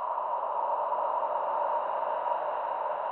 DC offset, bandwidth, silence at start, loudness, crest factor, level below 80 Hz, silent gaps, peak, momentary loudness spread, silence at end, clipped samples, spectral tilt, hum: under 0.1%; 4.2 kHz; 0 s; -31 LUFS; 14 dB; -84 dBFS; none; -16 dBFS; 2 LU; 0 s; under 0.1%; -0.5 dB/octave; none